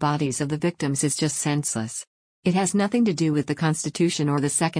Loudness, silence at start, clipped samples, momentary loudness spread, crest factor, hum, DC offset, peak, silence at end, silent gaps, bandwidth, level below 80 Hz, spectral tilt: -23 LUFS; 0 s; under 0.1%; 5 LU; 14 dB; none; under 0.1%; -10 dBFS; 0 s; 2.07-2.43 s; 10.5 kHz; -62 dBFS; -5 dB/octave